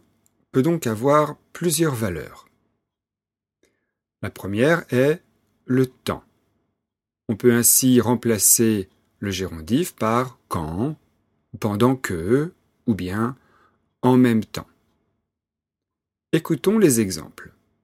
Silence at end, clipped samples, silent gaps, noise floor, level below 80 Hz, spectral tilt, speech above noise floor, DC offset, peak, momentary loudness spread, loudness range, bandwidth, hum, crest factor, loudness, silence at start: 0.35 s; under 0.1%; none; -89 dBFS; -54 dBFS; -4.5 dB/octave; 69 dB; under 0.1%; -2 dBFS; 17 LU; 7 LU; 16.5 kHz; none; 20 dB; -20 LUFS; 0.55 s